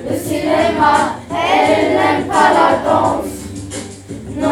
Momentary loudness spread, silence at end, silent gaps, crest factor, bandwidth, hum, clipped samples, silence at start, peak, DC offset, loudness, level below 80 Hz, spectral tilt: 15 LU; 0 s; none; 14 dB; 18 kHz; none; under 0.1%; 0 s; 0 dBFS; under 0.1%; -14 LUFS; -44 dBFS; -4.5 dB/octave